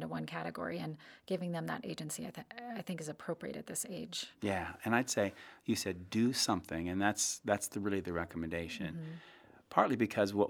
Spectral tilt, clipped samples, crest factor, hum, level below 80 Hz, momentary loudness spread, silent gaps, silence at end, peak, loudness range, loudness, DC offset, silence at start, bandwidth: -4 dB/octave; under 0.1%; 26 dB; none; -70 dBFS; 11 LU; none; 0 s; -12 dBFS; 7 LU; -37 LUFS; under 0.1%; 0 s; over 20 kHz